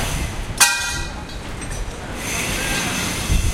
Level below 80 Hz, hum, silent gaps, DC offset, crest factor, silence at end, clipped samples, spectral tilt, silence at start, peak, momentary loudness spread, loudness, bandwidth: -28 dBFS; none; none; under 0.1%; 22 dB; 0 s; under 0.1%; -2.5 dB/octave; 0 s; 0 dBFS; 15 LU; -21 LUFS; 16 kHz